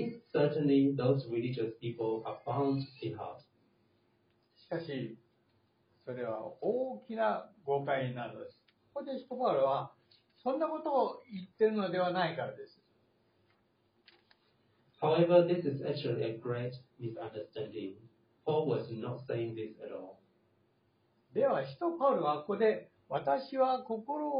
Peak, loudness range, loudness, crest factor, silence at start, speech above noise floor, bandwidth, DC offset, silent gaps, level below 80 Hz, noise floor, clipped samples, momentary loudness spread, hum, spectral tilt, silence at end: -14 dBFS; 7 LU; -34 LUFS; 22 dB; 0 s; 40 dB; 5 kHz; under 0.1%; none; -80 dBFS; -73 dBFS; under 0.1%; 15 LU; none; -6 dB/octave; 0 s